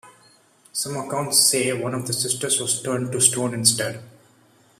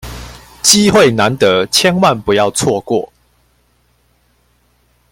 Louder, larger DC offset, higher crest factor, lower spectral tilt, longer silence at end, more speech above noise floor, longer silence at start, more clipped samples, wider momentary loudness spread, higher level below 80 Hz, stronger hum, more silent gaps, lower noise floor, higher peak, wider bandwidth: second, -20 LUFS vs -11 LUFS; neither; first, 24 dB vs 14 dB; about the same, -2.5 dB/octave vs -3.5 dB/octave; second, 0.7 s vs 2.05 s; second, 34 dB vs 45 dB; about the same, 0.05 s vs 0.05 s; neither; about the same, 11 LU vs 12 LU; second, -64 dBFS vs -42 dBFS; second, none vs 60 Hz at -45 dBFS; neither; about the same, -56 dBFS vs -56 dBFS; about the same, 0 dBFS vs 0 dBFS; about the same, 15.5 kHz vs 16.5 kHz